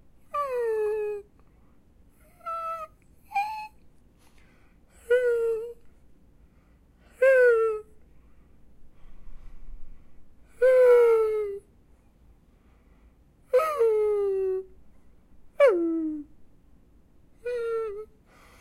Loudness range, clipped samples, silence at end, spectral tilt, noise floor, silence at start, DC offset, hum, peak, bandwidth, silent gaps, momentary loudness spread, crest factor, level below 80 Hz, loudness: 9 LU; under 0.1%; 0.55 s; -5 dB/octave; -58 dBFS; 0.35 s; under 0.1%; none; -10 dBFS; 13.5 kHz; none; 20 LU; 18 dB; -54 dBFS; -25 LUFS